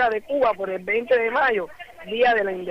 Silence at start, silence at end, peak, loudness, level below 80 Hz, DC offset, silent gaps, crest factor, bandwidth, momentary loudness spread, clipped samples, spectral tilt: 0 s; 0 s; -10 dBFS; -22 LUFS; -58 dBFS; under 0.1%; none; 12 dB; 6 kHz; 11 LU; under 0.1%; -5.5 dB/octave